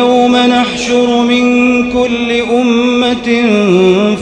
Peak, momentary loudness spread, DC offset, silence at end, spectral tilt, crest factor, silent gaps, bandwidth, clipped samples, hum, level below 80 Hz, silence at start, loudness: 0 dBFS; 4 LU; under 0.1%; 0 s; -5 dB/octave; 10 dB; none; 9.6 kHz; 0.3%; none; -40 dBFS; 0 s; -10 LUFS